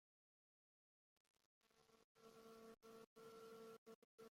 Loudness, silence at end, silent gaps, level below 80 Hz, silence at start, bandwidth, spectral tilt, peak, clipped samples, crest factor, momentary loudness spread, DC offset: -64 LUFS; 0 s; 1.46-1.61 s, 2.04-2.15 s, 3.07-3.16 s, 3.78-3.86 s, 3.95-4.18 s; under -90 dBFS; 1.45 s; 16 kHz; -4 dB/octave; -52 dBFS; under 0.1%; 14 dB; 6 LU; under 0.1%